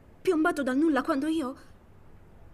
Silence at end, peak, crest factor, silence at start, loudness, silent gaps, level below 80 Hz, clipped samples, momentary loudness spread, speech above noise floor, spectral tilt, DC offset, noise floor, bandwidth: 0.05 s; -14 dBFS; 14 dB; 0.25 s; -27 LUFS; none; -56 dBFS; under 0.1%; 9 LU; 24 dB; -5 dB/octave; under 0.1%; -52 dBFS; 14 kHz